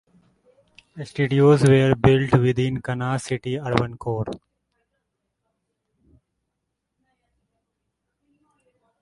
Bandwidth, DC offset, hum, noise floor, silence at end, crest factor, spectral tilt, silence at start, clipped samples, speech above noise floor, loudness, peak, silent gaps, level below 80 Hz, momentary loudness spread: 11.5 kHz; under 0.1%; none; -79 dBFS; 4.65 s; 24 dB; -7 dB/octave; 0.95 s; under 0.1%; 60 dB; -20 LUFS; 0 dBFS; none; -48 dBFS; 15 LU